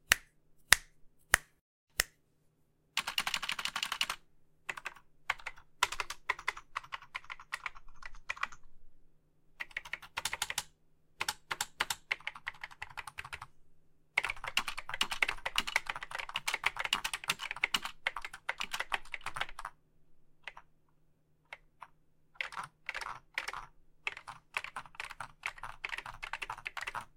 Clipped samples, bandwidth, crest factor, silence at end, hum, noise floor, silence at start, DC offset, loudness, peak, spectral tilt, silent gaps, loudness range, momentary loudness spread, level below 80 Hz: under 0.1%; 16.5 kHz; 40 dB; 0.1 s; none; -72 dBFS; 0.1 s; under 0.1%; -36 LUFS; 0 dBFS; 0.5 dB/octave; 1.61-1.87 s; 10 LU; 15 LU; -58 dBFS